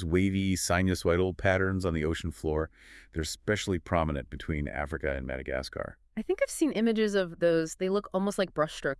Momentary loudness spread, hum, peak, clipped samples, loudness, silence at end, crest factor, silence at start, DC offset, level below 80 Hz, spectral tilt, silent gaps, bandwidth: 9 LU; none; -12 dBFS; under 0.1%; -30 LUFS; 0.05 s; 18 dB; 0 s; under 0.1%; -46 dBFS; -5.5 dB/octave; none; 12 kHz